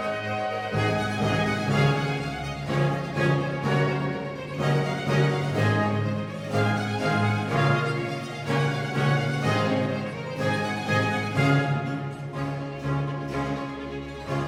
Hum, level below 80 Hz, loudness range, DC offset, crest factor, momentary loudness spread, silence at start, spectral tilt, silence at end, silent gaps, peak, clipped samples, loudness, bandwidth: none; -52 dBFS; 2 LU; under 0.1%; 16 dB; 8 LU; 0 s; -6.5 dB/octave; 0 s; none; -10 dBFS; under 0.1%; -26 LUFS; 12.5 kHz